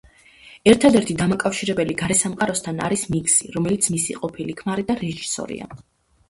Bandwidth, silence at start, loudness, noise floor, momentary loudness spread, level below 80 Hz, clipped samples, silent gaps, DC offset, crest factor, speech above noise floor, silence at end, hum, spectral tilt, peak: 12 kHz; 0.45 s; -20 LUFS; -48 dBFS; 12 LU; -50 dBFS; under 0.1%; none; under 0.1%; 22 dB; 27 dB; 0.55 s; none; -4 dB/octave; 0 dBFS